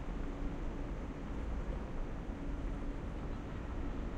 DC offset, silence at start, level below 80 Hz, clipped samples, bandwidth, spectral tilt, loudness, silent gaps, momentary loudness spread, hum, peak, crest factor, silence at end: under 0.1%; 0 s; -42 dBFS; under 0.1%; 8.2 kHz; -7.5 dB/octave; -44 LUFS; none; 2 LU; none; -28 dBFS; 12 dB; 0 s